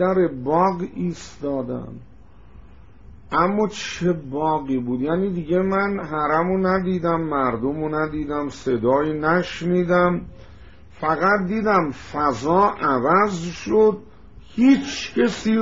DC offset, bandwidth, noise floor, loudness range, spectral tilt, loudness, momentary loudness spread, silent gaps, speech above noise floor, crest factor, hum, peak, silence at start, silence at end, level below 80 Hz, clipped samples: 0.5%; 7.8 kHz; -46 dBFS; 6 LU; -5.5 dB/octave; -21 LUFS; 9 LU; none; 26 dB; 16 dB; none; -4 dBFS; 0 s; 0 s; -48 dBFS; under 0.1%